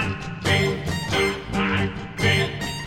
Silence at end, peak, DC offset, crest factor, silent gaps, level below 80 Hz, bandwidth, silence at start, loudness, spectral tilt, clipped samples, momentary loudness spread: 0 s; -8 dBFS; under 0.1%; 16 dB; none; -40 dBFS; 17 kHz; 0 s; -23 LUFS; -5 dB/octave; under 0.1%; 7 LU